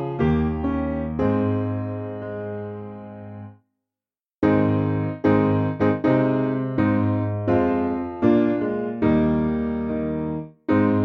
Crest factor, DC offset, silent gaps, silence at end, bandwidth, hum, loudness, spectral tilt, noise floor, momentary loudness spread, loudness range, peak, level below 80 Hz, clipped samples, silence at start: 16 dB; under 0.1%; none; 0 s; 5.8 kHz; none; -22 LUFS; -10.5 dB/octave; under -90 dBFS; 12 LU; 6 LU; -6 dBFS; -42 dBFS; under 0.1%; 0 s